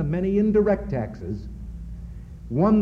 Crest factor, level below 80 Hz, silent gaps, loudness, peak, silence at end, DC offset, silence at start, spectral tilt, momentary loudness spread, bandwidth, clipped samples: 16 dB; -38 dBFS; none; -24 LUFS; -8 dBFS; 0 s; under 0.1%; 0 s; -10.5 dB/octave; 19 LU; 5.8 kHz; under 0.1%